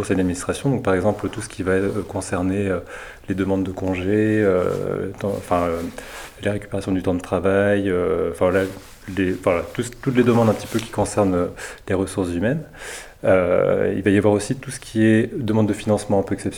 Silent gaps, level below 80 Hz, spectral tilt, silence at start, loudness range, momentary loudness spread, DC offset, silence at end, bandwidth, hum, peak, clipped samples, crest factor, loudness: none; -46 dBFS; -6.5 dB/octave; 0 s; 3 LU; 11 LU; under 0.1%; 0 s; 19.5 kHz; none; -4 dBFS; under 0.1%; 18 dB; -21 LUFS